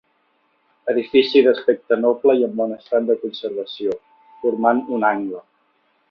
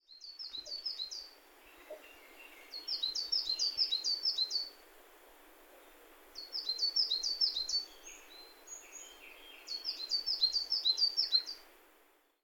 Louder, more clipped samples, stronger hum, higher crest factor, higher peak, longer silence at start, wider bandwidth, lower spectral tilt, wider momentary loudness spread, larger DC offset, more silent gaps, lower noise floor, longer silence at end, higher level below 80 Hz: first, -19 LUFS vs -33 LUFS; neither; neither; about the same, 18 dB vs 20 dB; first, -2 dBFS vs -18 dBFS; first, 0.85 s vs 0.1 s; second, 5.8 kHz vs 18 kHz; first, -7 dB/octave vs 2.5 dB/octave; second, 12 LU vs 22 LU; neither; neither; second, -64 dBFS vs -68 dBFS; about the same, 0.7 s vs 0.7 s; first, -66 dBFS vs -72 dBFS